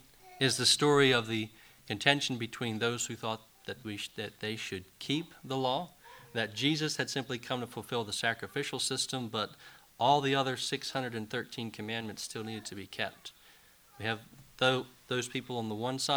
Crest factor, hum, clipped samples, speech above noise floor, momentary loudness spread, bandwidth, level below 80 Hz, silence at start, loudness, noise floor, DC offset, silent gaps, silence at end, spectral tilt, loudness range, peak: 26 dB; none; under 0.1%; 27 dB; 14 LU; over 20 kHz; -68 dBFS; 0.25 s; -32 LUFS; -60 dBFS; under 0.1%; none; 0 s; -3.5 dB/octave; 8 LU; -8 dBFS